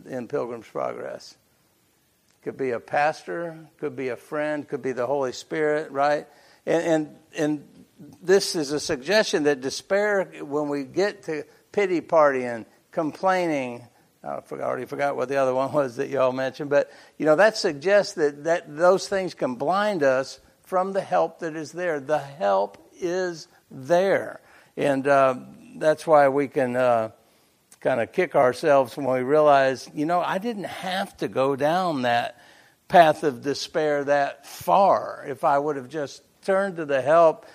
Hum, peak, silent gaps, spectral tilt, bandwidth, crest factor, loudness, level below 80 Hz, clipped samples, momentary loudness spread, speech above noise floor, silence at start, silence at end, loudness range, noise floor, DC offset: none; -2 dBFS; none; -5 dB/octave; 15.5 kHz; 22 dB; -23 LUFS; -70 dBFS; under 0.1%; 14 LU; 42 dB; 0.05 s; 0.2 s; 5 LU; -65 dBFS; under 0.1%